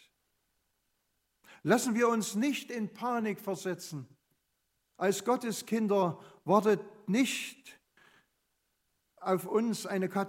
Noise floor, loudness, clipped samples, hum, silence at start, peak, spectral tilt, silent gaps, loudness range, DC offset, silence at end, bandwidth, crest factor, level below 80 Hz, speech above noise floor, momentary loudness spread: -80 dBFS; -31 LUFS; under 0.1%; none; 1.5 s; -10 dBFS; -5 dB/octave; none; 4 LU; under 0.1%; 0 s; 16 kHz; 22 dB; -84 dBFS; 49 dB; 11 LU